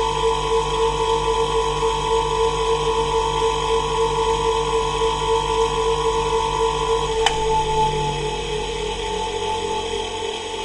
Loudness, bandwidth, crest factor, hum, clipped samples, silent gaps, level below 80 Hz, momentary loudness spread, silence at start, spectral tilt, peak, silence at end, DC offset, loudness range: -21 LUFS; 11.5 kHz; 18 dB; none; under 0.1%; none; -34 dBFS; 5 LU; 0 s; -3.5 dB/octave; -2 dBFS; 0 s; under 0.1%; 2 LU